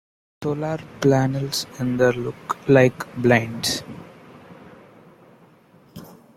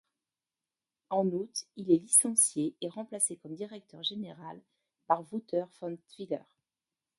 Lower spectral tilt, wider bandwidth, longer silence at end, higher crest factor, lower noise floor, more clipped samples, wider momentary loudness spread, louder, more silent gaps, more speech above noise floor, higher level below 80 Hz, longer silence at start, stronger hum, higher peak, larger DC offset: first, -5.5 dB/octave vs -3.5 dB/octave; first, 16 kHz vs 12 kHz; second, 0.25 s vs 0.8 s; second, 20 dB vs 26 dB; second, -53 dBFS vs under -90 dBFS; neither; first, 22 LU vs 19 LU; first, -21 LUFS vs -30 LUFS; neither; second, 32 dB vs over 58 dB; first, -56 dBFS vs -84 dBFS; second, 0.4 s vs 1.1 s; neither; first, -2 dBFS vs -8 dBFS; neither